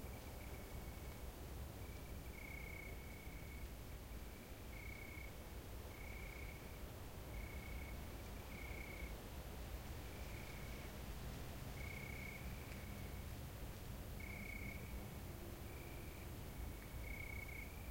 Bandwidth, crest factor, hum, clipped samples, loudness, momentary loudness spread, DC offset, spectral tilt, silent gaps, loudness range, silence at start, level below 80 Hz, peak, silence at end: 16.5 kHz; 14 dB; none; under 0.1%; -52 LUFS; 4 LU; under 0.1%; -5 dB/octave; none; 2 LU; 0 s; -54 dBFS; -36 dBFS; 0 s